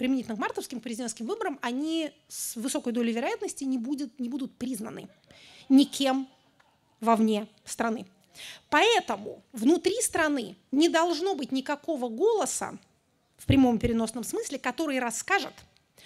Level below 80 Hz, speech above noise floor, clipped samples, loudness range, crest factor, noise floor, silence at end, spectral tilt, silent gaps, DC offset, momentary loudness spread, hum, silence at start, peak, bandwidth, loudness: -54 dBFS; 41 dB; under 0.1%; 5 LU; 20 dB; -69 dBFS; 0.45 s; -4 dB/octave; none; under 0.1%; 13 LU; none; 0 s; -8 dBFS; 15 kHz; -28 LUFS